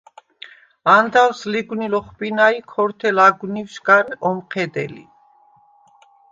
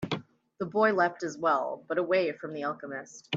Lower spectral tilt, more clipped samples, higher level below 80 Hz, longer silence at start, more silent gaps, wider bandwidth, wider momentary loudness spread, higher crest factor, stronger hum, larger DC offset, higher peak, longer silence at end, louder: about the same, -5 dB/octave vs -5 dB/octave; neither; first, -64 dBFS vs -72 dBFS; first, 0.85 s vs 0 s; neither; about the same, 7.6 kHz vs 8 kHz; about the same, 11 LU vs 13 LU; about the same, 20 dB vs 18 dB; neither; neither; first, 0 dBFS vs -12 dBFS; first, 1.3 s vs 0 s; first, -17 LUFS vs -29 LUFS